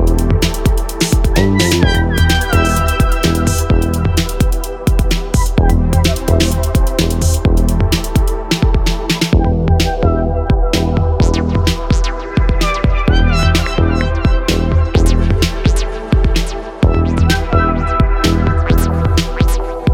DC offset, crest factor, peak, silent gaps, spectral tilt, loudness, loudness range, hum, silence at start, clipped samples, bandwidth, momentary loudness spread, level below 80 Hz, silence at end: under 0.1%; 12 dB; 0 dBFS; none; -5.5 dB/octave; -14 LUFS; 1 LU; none; 0 s; under 0.1%; 17.5 kHz; 4 LU; -16 dBFS; 0 s